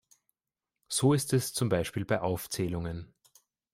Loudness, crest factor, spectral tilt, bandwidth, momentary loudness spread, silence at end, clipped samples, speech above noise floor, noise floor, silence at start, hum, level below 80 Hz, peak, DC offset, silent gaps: -30 LUFS; 18 dB; -5 dB/octave; 16 kHz; 9 LU; 0.7 s; under 0.1%; over 61 dB; under -90 dBFS; 0.9 s; none; -58 dBFS; -14 dBFS; under 0.1%; none